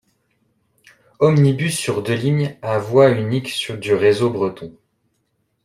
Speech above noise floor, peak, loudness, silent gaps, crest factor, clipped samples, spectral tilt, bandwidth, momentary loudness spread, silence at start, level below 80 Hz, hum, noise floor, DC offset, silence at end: 51 dB; -2 dBFS; -18 LUFS; none; 18 dB; under 0.1%; -6 dB/octave; 15.5 kHz; 10 LU; 1.2 s; -58 dBFS; none; -69 dBFS; under 0.1%; 0.95 s